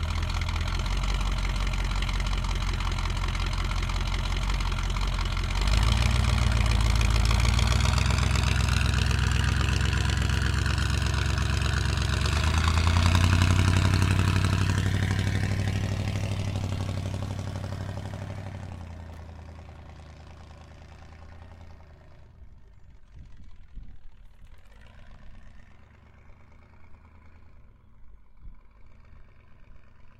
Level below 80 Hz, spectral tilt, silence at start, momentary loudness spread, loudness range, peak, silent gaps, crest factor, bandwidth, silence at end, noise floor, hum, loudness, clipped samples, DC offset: -30 dBFS; -5 dB/octave; 0 s; 21 LU; 16 LU; -6 dBFS; none; 22 dB; 14 kHz; 0.1 s; -52 dBFS; none; -27 LUFS; under 0.1%; under 0.1%